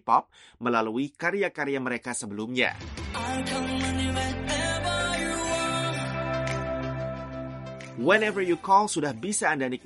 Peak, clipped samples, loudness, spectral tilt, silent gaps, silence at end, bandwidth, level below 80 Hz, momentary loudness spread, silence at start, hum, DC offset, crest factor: -6 dBFS; under 0.1%; -27 LUFS; -4 dB/octave; none; 0.05 s; 11.5 kHz; -46 dBFS; 11 LU; 0.05 s; none; under 0.1%; 20 dB